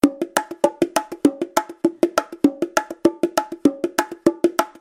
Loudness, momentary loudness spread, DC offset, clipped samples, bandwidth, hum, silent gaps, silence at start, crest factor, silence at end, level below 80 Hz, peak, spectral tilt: -21 LUFS; 4 LU; under 0.1%; under 0.1%; 16.5 kHz; none; none; 0.05 s; 20 dB; 0.1 s; -58 dBFS; 0 dBFS; -4 dB/octave